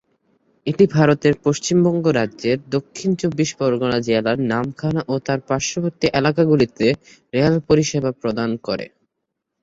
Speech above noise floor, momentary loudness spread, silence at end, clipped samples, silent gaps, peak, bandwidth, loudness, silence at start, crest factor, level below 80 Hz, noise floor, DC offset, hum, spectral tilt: 60 dB; 8 LU; 0.75 s; under 0.1%; none; -2 dBFS; 8 kHz; -19 LUFS; 0.65 s; 18 dB; -50 dBFS; -78 dBFS; under 0.1%; none; -6 dB/octave